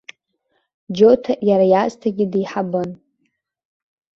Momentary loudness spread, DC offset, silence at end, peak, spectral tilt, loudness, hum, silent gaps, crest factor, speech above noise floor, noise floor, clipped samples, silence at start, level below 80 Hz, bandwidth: 11 LU; under 0.1%; 1.2 s; -2 dBFS; -7.5 dB/octave; -17 LUFS; none; none; 18 dB; 54 dB; -70 dBFS; under 0.1%; 0.9 s; -60 dBFS; 7.4 kHz